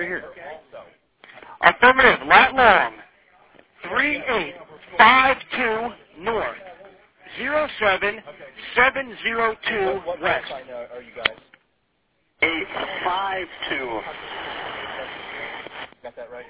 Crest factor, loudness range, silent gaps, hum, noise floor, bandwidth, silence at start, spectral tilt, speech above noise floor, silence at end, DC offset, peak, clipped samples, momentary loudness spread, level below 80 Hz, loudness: 22 dB; 9 LU; none; none; -69 dBFS; 4 kHz; 0 s; -6.5 dB/octave; 48 dB; 0.05 s; under 0.1%; 0 dBFS; under 0.1%; 23 LU; -52 dBFS; -19 LUFS